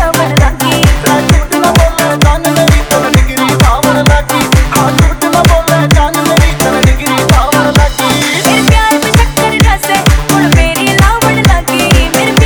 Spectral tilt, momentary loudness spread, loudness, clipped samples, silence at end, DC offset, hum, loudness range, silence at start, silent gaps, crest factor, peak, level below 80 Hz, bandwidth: -4.5 dB/octave; 2 LU; -8 LUFS; 0.3%; 0 s; 0.1%; none; 0 LU; 0 s; none; 8 dB; 0 dBFS; -14 dBFS; over 20 kHz